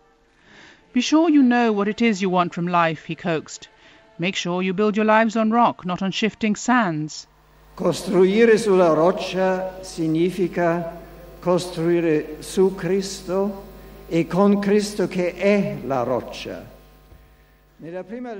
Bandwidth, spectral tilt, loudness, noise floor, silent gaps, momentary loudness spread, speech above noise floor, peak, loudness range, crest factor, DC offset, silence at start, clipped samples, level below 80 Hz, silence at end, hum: 16 kHz; -5.5 dB/octave; -20 LUFS; -56 dBFS; none; 14 LU; 36 dB; -2 dBFS; 4 LU; 18 dB; under 0.1%; 0.95 s; under 0.1%; -52 dBFS; 0 s; none